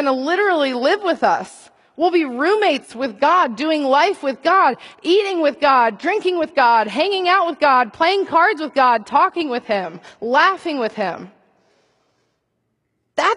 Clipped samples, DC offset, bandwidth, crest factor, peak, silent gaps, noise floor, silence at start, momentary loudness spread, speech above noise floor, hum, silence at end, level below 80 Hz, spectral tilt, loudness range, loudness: under 0.1%; under 0.1%; 11.5 kHz; 16 dB; -2 dBFS; none; -71 dBFS; 0 s; 8 LU; 54 dB; none; 0 s; -66 dBFS; -4 dB/octave; 6 LU; -17 LUFS